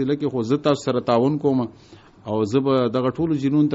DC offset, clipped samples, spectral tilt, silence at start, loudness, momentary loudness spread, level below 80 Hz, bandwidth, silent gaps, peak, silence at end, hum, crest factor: under 0.1%; under 0.1%; -7 dB/octave; 0 s; -21 LUFS; 6 LU; -56 dBFS; 8 kHz; none; -6 dBFS; 0 s; none; 16 dB